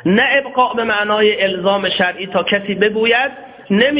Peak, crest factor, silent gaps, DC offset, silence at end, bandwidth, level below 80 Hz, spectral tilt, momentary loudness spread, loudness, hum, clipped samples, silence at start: 0 dBFS; 16 dB; none; under 0.1%; 0 s; 4 kHz; -54 dBFS; -8.5 dB/octave; 4 LU; -15 LUFS; none; under 0.1%; 0.05 s